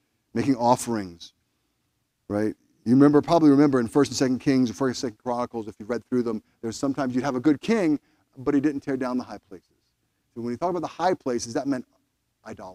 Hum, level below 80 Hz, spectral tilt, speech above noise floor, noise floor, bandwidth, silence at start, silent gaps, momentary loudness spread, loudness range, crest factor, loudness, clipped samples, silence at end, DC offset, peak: none; -60 dBFS; -6 dB/octave; 51 dB; -74 dBFS; 14 kHz; 0.35 s; none; 15 LU; 8 LU; 20 dB; -24 LUFS; under 0.1%; 0 s; under 0.1%; -4 dBFS